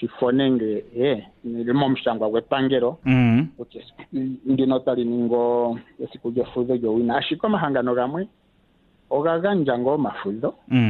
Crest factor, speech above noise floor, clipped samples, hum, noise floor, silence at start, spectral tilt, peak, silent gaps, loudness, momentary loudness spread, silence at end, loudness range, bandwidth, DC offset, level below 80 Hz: 16 dB; 38 dB; under 0.1%; none; -60 dBFS; 0 s; -9.5 dB/octave; -6 dBFS; none; -22 LUFS; 11 LU; 0 s; 2 LU; 4.3 kHz; under 0.1%; -54 dBFS